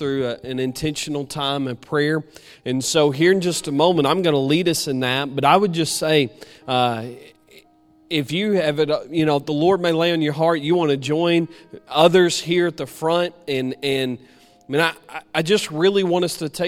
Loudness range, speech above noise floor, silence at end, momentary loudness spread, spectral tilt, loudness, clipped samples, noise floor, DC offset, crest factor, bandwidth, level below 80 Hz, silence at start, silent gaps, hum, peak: 4 LU; 34 dB; 0 s; 9 LU; -4.5 dB/octave; -20 LUFS; under 0.1%; -54 dBFS; under 0.1%; 20 dB; 16 kHz; -56 dBFS; 0 s; none; none; 0 dBFS